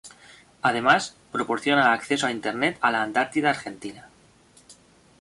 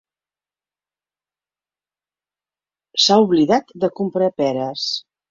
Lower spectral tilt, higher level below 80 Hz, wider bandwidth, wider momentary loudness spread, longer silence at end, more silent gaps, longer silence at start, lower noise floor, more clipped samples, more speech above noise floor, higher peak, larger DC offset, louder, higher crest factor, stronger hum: about the same, -3.5 dB/octave vs -4.5 dB/octave; about the same, -64 dBFS vs -64 dBFS; first, 11.5 kHz vs 7.8 kHz; about the same, 11 LU vs 10 LU; first, 0.5 s vs 0.3 s; neither; second, 0.05 s vs 2.95 s; second, -56 dBFS vs under -90 dBFS; neither; second, 32 dB vs over 73 dB; about the same, -4 dBFS vs -2 dBFS; neither; second, -23 LUFS vs -18 LUFS; about the same, 22 dB vs 20 dB; second, none vs 50 Hz at -50 dBFS